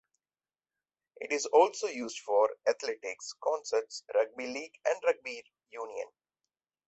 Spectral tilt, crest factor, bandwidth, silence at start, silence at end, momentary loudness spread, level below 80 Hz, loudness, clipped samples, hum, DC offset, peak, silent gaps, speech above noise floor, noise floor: -1 dB/octave; 22 dB; 8.2 kHz; 1.2 s; 0.8 s; 16 LU; -82 dBFS; -32 LUFS; under 0.1%; none; under 0.1%; -12 dBFS; none; over 59 dB; under -90 dBFS